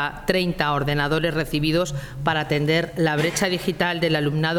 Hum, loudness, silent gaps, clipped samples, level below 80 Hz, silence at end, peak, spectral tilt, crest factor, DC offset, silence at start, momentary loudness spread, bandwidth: none; -22 LUFS; none; under 0.1%; -42 dBFS; 0 s; -4 dBFS; -5 dB/octave; 18 dB; under 0.1%; 0 s; 3 LU; 17.5 kHz